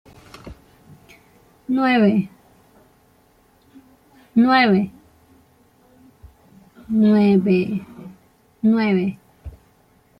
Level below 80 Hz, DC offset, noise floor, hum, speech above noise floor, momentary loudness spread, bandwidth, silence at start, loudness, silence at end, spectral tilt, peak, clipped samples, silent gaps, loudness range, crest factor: -54 dBFS; under 0.1%; -57 dBFS; none; 40 dB; 27 LU; 5.6 kHz; 0.45 s; -18 LUFS; 0.7 s; -8 dB/octave; -4 dBFS; under 0.1%; none; 4 LU; 18 dB